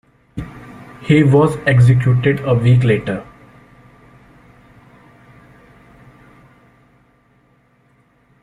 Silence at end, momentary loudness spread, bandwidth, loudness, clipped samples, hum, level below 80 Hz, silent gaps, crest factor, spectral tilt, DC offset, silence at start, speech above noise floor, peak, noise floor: 5.2 s; 22 LU; 11 kHz; -14 LUFS; under 0.1%; none; -46 dBFS; none; 16 dB; -8.5 dB/octave; under 0.1%; 0.35 s; 43 dB; -2 dBFS; -56 dBFS